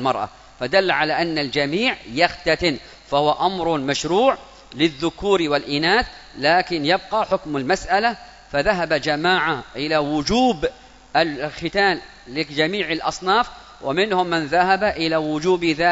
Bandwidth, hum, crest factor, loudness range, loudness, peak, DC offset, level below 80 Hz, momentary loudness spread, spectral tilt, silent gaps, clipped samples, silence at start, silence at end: 8 kHz; none; 20 dB; 2 LU; -20 LUFS; 0 dBFS; under 0.1%; -46 dBFS; 8 LU; -4.5 dB/octave; none; under 0.1%; 0 s; 0 s